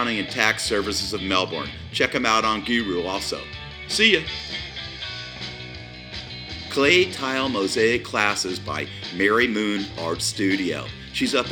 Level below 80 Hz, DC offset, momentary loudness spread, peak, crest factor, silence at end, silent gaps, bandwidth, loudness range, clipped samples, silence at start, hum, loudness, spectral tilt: -48 dBFS; under 0.1%; 15 LU; 0 dBFS; 24 dB; 0 s; none; 19 kHz; 3 LU; under 0.1%; 0 s; none; -22 LUFS; -3 dB/octave